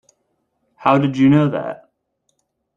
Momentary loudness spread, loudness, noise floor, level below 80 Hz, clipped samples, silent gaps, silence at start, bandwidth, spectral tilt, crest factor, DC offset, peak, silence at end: 16 LU; -16 LUFS; -70 dBFS; -60 dBFS; under 0.1%; none; 0.8 s; 7.2 kHz; -8.5 dB/octave; 18 dB; under 0.1%; -2 dBFS; 1 s